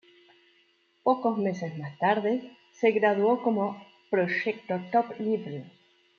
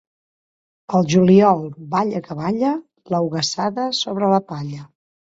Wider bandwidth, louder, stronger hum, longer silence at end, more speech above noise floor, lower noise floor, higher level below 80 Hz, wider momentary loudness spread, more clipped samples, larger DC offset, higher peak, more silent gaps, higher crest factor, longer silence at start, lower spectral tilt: second, 6.8 kHz vs 7.8 kHz; second, -27 LUFS vs -19 LUFS; neither; about the same, 0.5 s vs 0.45 s; second, 40 dB vs over 72 dB; second, -66 dBFS vs under -90 dBFS; second, -80 dBFS vs -60 dBFS; second, 10 LU vs 15 LU; neither; neither; second, -10 dBFS vs -2 dBFS; neither; about the same, 20 dB vs 18 dB; first, 1.05 s vs 0.9 s; first, -7.5 dB/octave vs -6 dB/octave